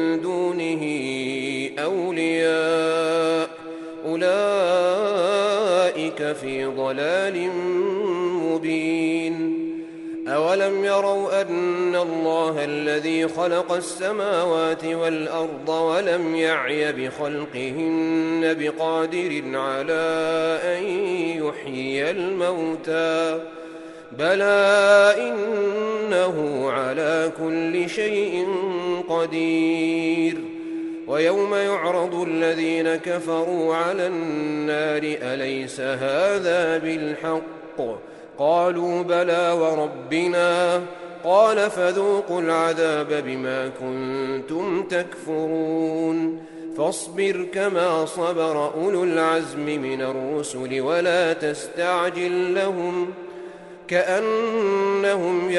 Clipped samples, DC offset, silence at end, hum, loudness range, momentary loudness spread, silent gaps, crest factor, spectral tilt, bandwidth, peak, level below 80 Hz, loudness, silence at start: under 0.1%; under 0.1%; 0 s; none; 4 LU; 7 LU; none; 18 dB; -5 dB/octave; 11.5 kHz; -4 dBFS; -70 dBFS; -22 LUFS; 0 s